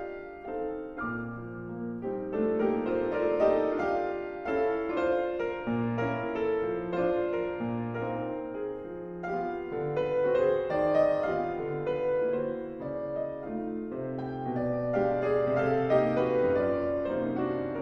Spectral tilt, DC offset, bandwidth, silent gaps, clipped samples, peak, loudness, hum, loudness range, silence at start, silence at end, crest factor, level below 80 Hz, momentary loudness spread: -9 dB/octave; under 0.1%; 6.6 kHz; none; under 0.1%; -14 dBFS; -30 LUFS; none; 5 LU; 0 s; 0 s; 16 dB; -56 dBFS; 10 LU